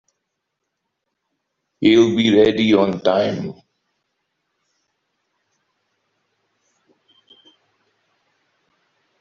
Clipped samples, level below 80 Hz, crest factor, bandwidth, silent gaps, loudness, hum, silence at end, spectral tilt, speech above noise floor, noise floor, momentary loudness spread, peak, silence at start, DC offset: under 0.1%; -60 dBFS; 20 dB; 7.2 kHz; none; -16 LUFS; none; 5.7 s; -6 dB/octave; 62 dB; -77 dBFS; 10 LU; -2 dBFS; 1.8 s; under 0.1%